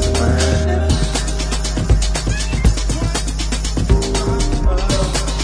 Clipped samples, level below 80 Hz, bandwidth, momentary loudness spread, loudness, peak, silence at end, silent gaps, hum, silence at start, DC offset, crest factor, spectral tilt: under 0.1%; -18 dBFS; 11 kHz; 4 LU; -18 LUFS; 0 dBFS; 0 s; none; none; 0 s; under 0.1%; 14 dB; -4.5 dB/octave